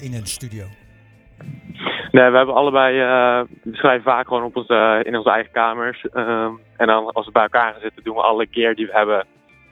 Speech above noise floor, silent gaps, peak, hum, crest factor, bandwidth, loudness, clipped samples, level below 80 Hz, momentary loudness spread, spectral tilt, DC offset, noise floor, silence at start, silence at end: 31 dB; none; 0 dBFS; none; 18 dB; 17 kHz; -17 LUFS; under 0.1%; -56 dBFS; 14 LU; -4.5 dB/octave; under 0.1%; -48 dBFS; 0 s; 0.5 s